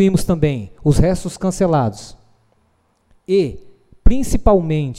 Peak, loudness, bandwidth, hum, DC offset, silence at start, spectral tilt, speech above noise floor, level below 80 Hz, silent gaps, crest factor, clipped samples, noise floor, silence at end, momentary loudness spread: 0 dBFS; -18 LUFS; 14.5 kHz; none; under 0.1%; 0 s; -7 dB/octave; 45 dB; -24 dBFS; none; 16 dB; under 0.1%; -61 dBFS; 0 s; 8 LU